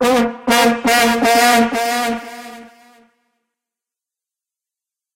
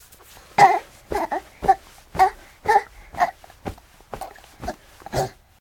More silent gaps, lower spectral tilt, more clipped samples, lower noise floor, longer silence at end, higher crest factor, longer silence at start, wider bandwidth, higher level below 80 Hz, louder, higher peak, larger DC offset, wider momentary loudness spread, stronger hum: neither; second, -2.5 dB/octave vs -4 dB/octave; neither; first, -87 dBFS vs -48 dBFS; first, 2.5 s vs 0.3 s; second, 16 dB vs 24 dB; second, 0 s vs 0.6 s; about the same, 16 kHz vs 17.5 kHz; second, -52 dBFS vs -46 dBFS; first, -14 LUFS vs -22 LUFS; about the same, -2 dBFS vs 0 dBFS; neither; second, 18 LU vs 21 LU; neither